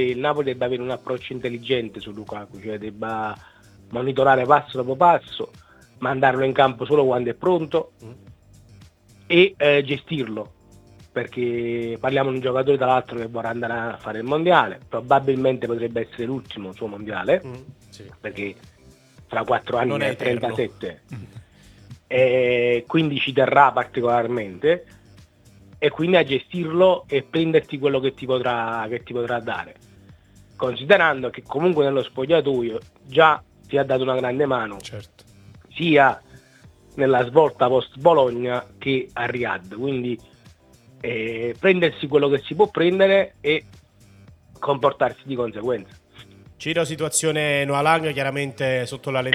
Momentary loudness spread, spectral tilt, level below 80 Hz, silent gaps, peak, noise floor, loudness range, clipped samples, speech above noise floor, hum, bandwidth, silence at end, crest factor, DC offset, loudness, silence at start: 15 LU; -5 dB/octave; -58 dBFS; none; 0 dBFS; -51 dBFS; 6 LU; under 0.1%; 30 dB; none; 14 kHz; 0 s; 22 dB; under 0.1%; -21 LUFS; 0 s